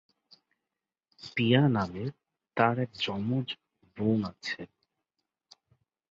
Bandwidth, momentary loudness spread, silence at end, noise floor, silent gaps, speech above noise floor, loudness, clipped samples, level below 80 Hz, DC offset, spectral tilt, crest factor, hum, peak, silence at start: 7.6 kHz; 15 LU; 1.45 s; -89 dBFS; none; 61 dB; -30 LUFS; under 0.1%; -64 dBFS; under 0.1%; -7 dB/octave; 22 dB; none; -10 dBFS; 1.2 s